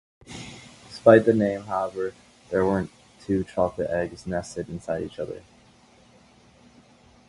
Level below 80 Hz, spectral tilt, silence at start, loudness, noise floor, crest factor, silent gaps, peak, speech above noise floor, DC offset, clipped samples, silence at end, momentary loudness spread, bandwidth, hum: -52 dBFS; -7 dB/octave; 0.3 s; -24 LUFS; -55 dBFS; 26 dB; none; 0 dBFS; 32 dB; under 0.1%; under 0.1%; 1.9 s; 24 LU; 11.5 kHz; none